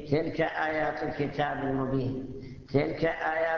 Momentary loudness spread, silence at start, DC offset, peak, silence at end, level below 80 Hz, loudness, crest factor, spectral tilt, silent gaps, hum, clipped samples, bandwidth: 6 LU; 0 s; under 0.1%; -10 dBFS; 0 s; -52 dBFS; -30 LUFS; 20 dB; -8 dB/octave; none; none; under 0.1%; 6.8 kHz